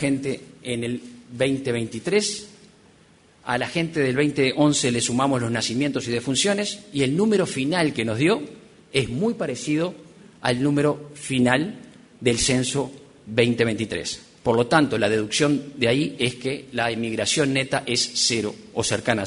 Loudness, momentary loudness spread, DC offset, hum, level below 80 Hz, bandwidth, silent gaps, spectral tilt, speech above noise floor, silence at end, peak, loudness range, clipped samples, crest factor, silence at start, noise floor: -23 LUFS; 9 LU; under 0.1%; none; -54 dBFS; 11 kHz; none; -4 dB/octave; 32 dB; 0 s; -4 dBFS; 3 LU; under 0.1%; 20 dB; 0 s; -54 dBFS